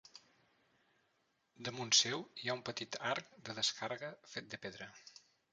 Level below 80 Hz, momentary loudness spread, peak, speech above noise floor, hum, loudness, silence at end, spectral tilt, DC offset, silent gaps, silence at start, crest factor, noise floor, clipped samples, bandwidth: -82 dBFS; 19 LU; -14 dBFS; 40 dB; none; -38 LUFS; 0.4 s; -1.5 dB/octave; under 0.1%; none; 0.15 s; 28 dB; -80 dBFS; under 0.1%; 9 kHz